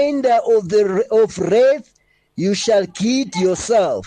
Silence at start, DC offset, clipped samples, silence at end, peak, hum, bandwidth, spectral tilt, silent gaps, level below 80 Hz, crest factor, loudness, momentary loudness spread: 0 s; under 0.1%; under 0.1%; 0 s; -6 dBFS; none; 10 kHz; -5 dB/octave; none; -54 dBFS; 10 dB; -17 LUFS; 5 LU